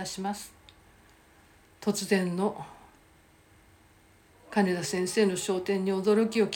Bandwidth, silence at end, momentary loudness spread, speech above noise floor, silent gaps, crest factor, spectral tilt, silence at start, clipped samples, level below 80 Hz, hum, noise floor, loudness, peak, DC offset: 17 kHz; 0 s; 12 LU; 32 dB; none; 18 dB; -5 dB/octave; 0 s; under 0.1%; -66 dBFS; none; -60 dBFS; -28 LUFS; -12 dBFS; under 0.1%